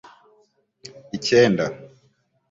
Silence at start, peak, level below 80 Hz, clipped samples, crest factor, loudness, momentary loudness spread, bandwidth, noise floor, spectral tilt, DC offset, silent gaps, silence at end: 1.15 s; -2 dBFS; -60 dBFS; under 0.1%; 22 dB; -19 LUFS; 26 LU; 7.8 kHz; -64 dBFS; -5 dB/octave; under 0.1%; none; 0.65 s